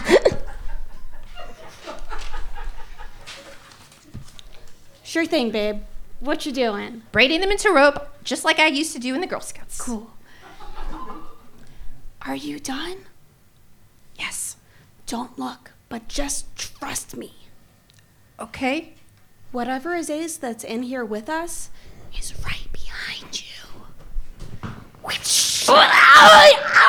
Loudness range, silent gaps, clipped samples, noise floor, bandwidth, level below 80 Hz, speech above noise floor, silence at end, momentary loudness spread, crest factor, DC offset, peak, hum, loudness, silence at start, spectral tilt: 16 LU; none; under 0.1%; -54 dBFS; 20 kHz; -36 dBFS; 36 dB; 0 s; 25 LU; 20 dB; under 0.1%; 0 dBFS; none; -17 LUFS; 0 s; -2 dB/octave